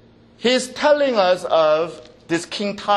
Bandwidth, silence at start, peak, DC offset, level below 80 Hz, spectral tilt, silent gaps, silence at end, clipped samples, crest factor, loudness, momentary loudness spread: 12 kHz; 0.4 s; -2 dBFS; under 0.1%; -60 dBFS; -3.5 dB/octave; none; 0 s; under 0.1%; 18 dB; -19 LUFS; 9 LU